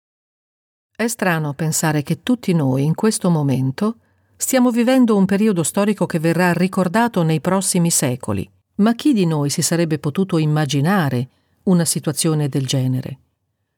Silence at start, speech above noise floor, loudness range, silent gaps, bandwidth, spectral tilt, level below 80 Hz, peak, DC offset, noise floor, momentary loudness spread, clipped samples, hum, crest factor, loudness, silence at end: 1 s; 53 dB; 3 LU; none; 18.5 kHz; -5 dB/octave; -60 dBFS; -4 dBFS; under 0.1%; -70 dBFS; 8 LU; under 0.1%; none; 14 dB; -18 LUFS; 0.6 s